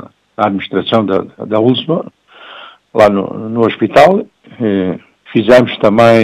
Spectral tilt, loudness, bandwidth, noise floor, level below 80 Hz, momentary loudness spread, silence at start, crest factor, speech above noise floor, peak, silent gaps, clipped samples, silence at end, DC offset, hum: -6.5 dB/octave; -12 LUFS; 13.5 kHz; -35 dBFS; -48 dBFS; 16 LU; 0.4 s; 12 dB; 25 dB; 0 dBFS; none; 0.1%; 0 s; under 0.1%; none